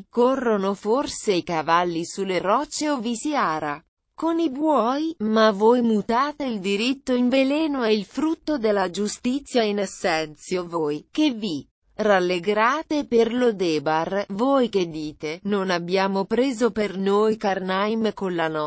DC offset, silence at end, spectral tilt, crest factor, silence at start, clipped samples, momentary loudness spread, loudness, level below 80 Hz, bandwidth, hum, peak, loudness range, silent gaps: under 0.1%; 0 s; -5 dB/octave; 16 dB; 0.15 s; under 0.1%; 7 LU; -23 LUFS; -58 dBFS; 8 kHz; none; -6 dBFS; 3 LU; 3.88-3.97 s, 11.71-11.82 s